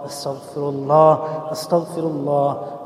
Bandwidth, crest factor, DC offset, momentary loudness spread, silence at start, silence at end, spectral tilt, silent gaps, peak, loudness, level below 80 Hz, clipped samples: 15 kHz; 18 dB; under 0.1%; 14 LU; 0 s; 0 s; -6.5 dB/octave; none; -2 dBFS; -20 LUFS; -66 dBFS; under 0.1%